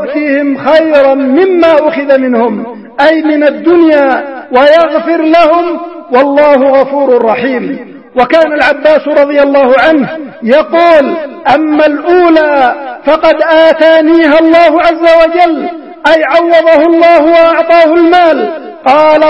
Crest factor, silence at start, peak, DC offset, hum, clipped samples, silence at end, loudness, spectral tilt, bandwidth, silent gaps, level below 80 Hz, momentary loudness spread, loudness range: 6 dB; 0 s; 0 dBFS; 0.5%; none; 2%; 0 s; -7 LUFS; -5.5 dB/octave; 7.8 kHz; none; -44 dBFS; 8 LU; 2 LU